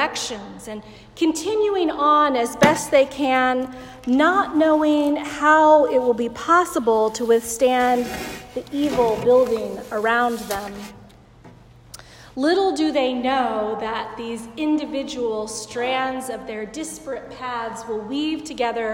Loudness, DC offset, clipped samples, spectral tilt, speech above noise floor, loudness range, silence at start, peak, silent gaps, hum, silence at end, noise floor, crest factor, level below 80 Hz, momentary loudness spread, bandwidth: -20 LUFS; under 0.1%; under 0.1%; -4 dB/octave; 26 dB; 8 LU; 0 s; 0 dBFS; none; none; 0 s; -46 dBFS; 20 dB; -52 dBFS; 14 LU; 16.5 kHz